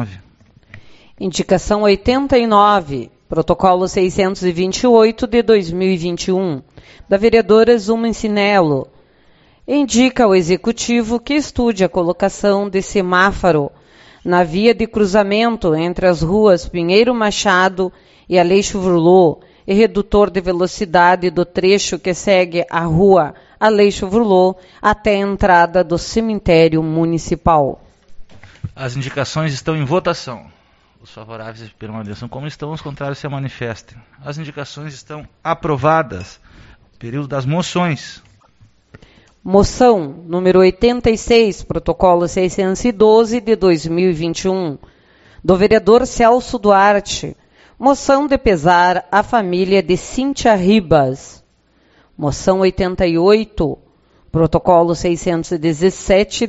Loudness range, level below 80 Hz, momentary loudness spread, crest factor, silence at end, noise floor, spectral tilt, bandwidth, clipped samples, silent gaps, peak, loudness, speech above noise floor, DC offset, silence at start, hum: 8 LU; -36 dBFS; 15 LU; 14 dB; 0 s; -55 dBFS; -5.5 dB/octave; 8.2 kHz; under 0.1%; none; 0 dBFS; -14 LUFS; 41 dB; under 0.1%; 0 s; none